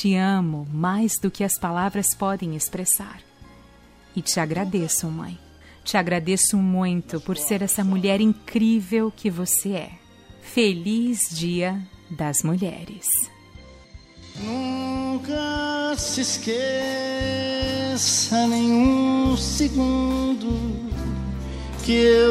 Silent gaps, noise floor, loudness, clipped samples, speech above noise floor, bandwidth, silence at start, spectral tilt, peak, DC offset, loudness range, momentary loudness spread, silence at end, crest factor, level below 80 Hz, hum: none; -50 dBFS; -22 LUFS; under 0.1%; 28 dB; 16 kHz; 0 s; -4 dB/octave; -6 dBFS; under 0.1%; 5 LU; 10 LU; 0 s; 18 dB; -40 dBFS; none